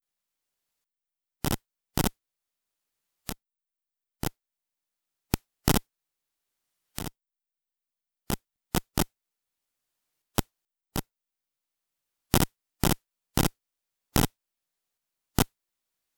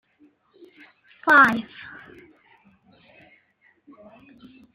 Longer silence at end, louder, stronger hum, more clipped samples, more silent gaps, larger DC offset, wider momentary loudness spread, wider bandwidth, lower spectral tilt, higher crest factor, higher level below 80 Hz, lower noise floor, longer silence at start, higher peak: second, 0.75 s vs 3.15 s; second, -31 LUFS vs -17 LUFS; neither; neither; neither; neither; second, 12 LU vs 27 LU; first, 18 kHz vs 15 kHz; about the same, -4.5 dB/octave vs -4.5 dB/octave; first, 34 dB vs 24 dB; first, -44 dBFS vs -68 dBFS; first, -87 dBFS vs -63 dBFS; first, 1.45 s vs 1.25 s; first, 0 dBFS vs -4 dBFS